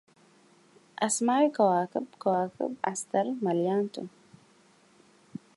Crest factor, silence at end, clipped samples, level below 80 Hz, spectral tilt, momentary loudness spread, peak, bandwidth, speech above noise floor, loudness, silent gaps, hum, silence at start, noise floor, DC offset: 18 dB; 1.5 s; under 0.1%; -82 dBFS; -4.5 dB/octave; 19 LU; -12 dBFS; 11.5 kHz; 34 dB; -28 LUFS; none; none; 1 s; -61 dBFS; under 0.1%